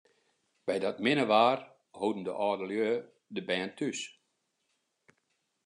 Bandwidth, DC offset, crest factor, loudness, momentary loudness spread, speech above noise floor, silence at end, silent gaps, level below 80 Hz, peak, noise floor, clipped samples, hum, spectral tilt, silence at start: 11 kHz; under 0.1%; 22 dB; -31 LUFS; 15 LU; 49 dB; 1.55 s; none; -86 dBFS; -10 dBFS; -79 dBFS; under 0.1%; none; -4.5 dB/octave; 0.65 s